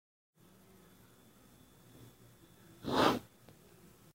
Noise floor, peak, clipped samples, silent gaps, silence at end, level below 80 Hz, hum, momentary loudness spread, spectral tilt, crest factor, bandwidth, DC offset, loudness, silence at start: -63 dBFS; -12 dBFS; under 0.1%; none; 0.95 s; -68 dBFS; none; 29 LU; -4.5 dB/octave; 28 dB; 16 kHz; under 0.1%; -33 LUFS; 2.85 s